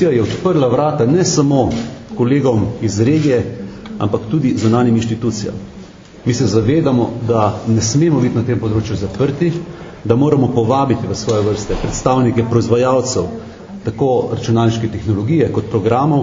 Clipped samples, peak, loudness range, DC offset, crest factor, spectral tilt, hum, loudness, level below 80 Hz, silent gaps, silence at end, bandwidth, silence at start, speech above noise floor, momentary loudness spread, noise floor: under 0.1%; 0 dBFS; 2 LU; under 0.1%; 14 dB; -6.5 dB/octave; none; -15 LUFS; -38 dBFS; none; 0 s; 7.6 kHz; 0 s; 21 dB; 10 LU; -36 dBFS